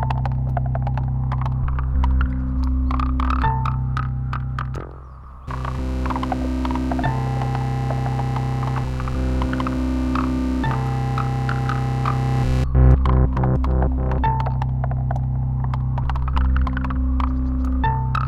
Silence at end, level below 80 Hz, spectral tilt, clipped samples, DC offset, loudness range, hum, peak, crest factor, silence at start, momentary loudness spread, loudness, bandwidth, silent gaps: 0 s; -24 dBFS; -8.5 dB/octave; under 0.1%; under 0.1%; 5 LU; none; -4 dBFS; 16 dB; 0 s; 5 LU; -22 LUFS; 7.6 kHz; none